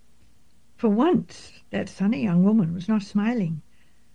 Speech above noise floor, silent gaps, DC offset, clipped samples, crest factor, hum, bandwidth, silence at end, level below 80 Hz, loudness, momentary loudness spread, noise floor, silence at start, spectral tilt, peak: 39 dB; none; 0.3%; under 0.1%; 14 dB; none; 9.4 kHz; 0.55 s; -60 dBFS; -24 LUFS; 13 LU; -62 dBFS; 0.8 s; -8 dB/octave; -10 dBFS